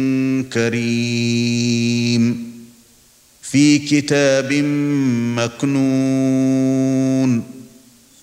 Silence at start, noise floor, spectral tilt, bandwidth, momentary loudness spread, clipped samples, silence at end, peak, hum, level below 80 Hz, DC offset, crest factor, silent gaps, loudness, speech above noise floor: 0 s; -51 dBFS; -5.5 dB/octave; 15 kHz; 5 LU; under 0.1%; 0.55 s; -2 dBFS; none; -62 dBFS; under 0.1%; 14 dB; none; -17 LUFS; 35 dB